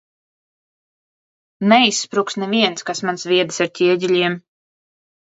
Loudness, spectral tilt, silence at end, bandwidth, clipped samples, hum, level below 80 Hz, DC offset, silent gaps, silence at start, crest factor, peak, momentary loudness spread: -17 LUFS; -3.5 dB/octave; 0.85 s; 8 kHz; under 0.1%; none; -70 dBFS; under 0.1%; none; 1.6 s; 20 dB; 0 dBFS; 10 LU